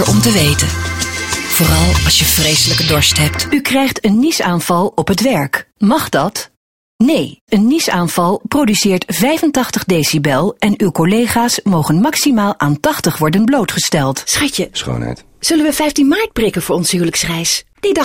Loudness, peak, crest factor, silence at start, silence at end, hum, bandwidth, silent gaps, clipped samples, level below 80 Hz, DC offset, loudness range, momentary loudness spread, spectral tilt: -13 LUFS; 0 dBFS; 14 dB; 0 s; 0 s; none; 16.5 kHz; 6.57-6.99 s, 7.41-7.47 s; under 0.1%; -30 dBFS; 0.3%; 3 LU; 6 LU; -4 dB/octave